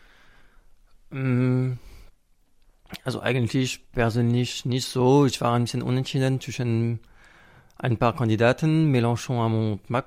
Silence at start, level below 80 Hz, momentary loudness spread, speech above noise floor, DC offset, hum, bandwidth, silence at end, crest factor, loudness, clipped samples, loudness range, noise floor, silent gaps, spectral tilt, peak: 1.1 s; -50 dBFS; 10 LU; 37 dB; under 0.1%; none; 15 kHz; 0.05 s; 18 dB; -24 LUFS; under 0.1%; 4 LU; -60 dBFS; none; -6.5 dB/octave; -6 dBFS